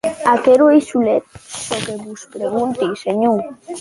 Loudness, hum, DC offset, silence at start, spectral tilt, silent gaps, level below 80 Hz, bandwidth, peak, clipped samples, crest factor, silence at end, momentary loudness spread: -16 LUFS; none; under 0.1%; 0.05 s; -5 dB/octave; none; -56 dBFS; 11.5 kHz; -2 dBFS; under 0.1%; 14 dB; 0 s; 18 LU